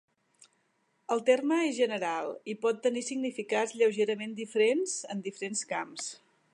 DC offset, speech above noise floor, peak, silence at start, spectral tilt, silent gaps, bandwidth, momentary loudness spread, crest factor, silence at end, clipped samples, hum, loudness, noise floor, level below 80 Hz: under 0.1%; 44 dB; -12 dBFS; 1.1 s; -3 dB/octave; none; 11 kHz; 11 LU; 20 dB; 0.35 s; under 0.1%; none; -30 LUFS; -74 dBFS; -86 dBFS